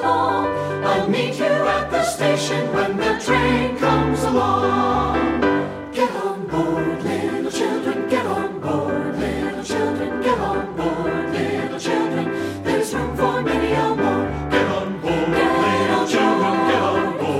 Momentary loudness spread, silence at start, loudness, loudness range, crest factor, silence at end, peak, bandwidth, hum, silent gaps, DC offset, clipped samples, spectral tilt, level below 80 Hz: 6 LU; 0 s; -20 LUFS; 4 LU; 16 dB; 0 s; -4 dBFS; 15.5 kHz; none; none; under 0.1%; under 0.1%; -5.5 dB/octave; -42 dBFS